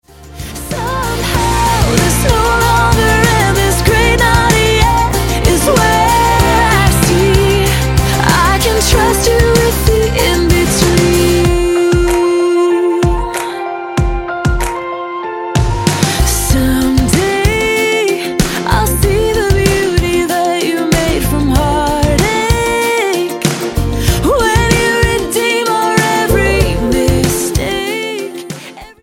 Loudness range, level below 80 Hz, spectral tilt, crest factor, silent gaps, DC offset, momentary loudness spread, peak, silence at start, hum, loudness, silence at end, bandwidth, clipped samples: 4 LU; -20 dBFS; -4.5 dB/octave; 12 dB; none; under 0.1%; 7 LU; 0 dBFS; 0.2 s; none; -12 LUFS; 0.1 s; 17 kHz; under 0.1%